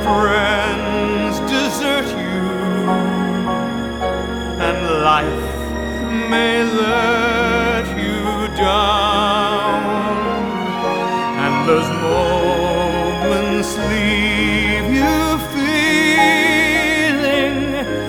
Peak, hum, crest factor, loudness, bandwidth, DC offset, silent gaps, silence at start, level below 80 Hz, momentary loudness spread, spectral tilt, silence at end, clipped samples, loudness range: -2 dBFS; none; 16 dB; -16 LUFS; 19.5 kHz; under 0.1%; none; 0 s; -32 dBFS; 7 LU; -4.5 dB/octave; 0 s; under 0.1%; 4 LU